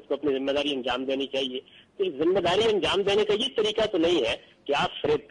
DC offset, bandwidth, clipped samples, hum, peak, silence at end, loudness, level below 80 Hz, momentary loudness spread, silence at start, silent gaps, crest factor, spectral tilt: under 0.1%; 10.5 kHz; under 0.1%; none; -14 dBFS; 0.1 s; -26 LUFS; -56 dBFS; 7 LU; 0.1 s; none; 12 dB; -4.5 dB/octave